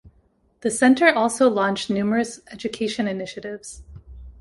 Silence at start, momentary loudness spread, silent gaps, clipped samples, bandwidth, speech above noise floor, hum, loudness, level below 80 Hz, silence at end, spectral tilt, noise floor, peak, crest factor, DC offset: 0.05 s; 18 LU; none; under 0.1%; 11.5 kHz; 40 dB; none; -21 LUFS; -50 dBFS; 0.1 s; -4 dB/octave; -61 dBFS; -2 dBFS; 20 dB; under 0.1%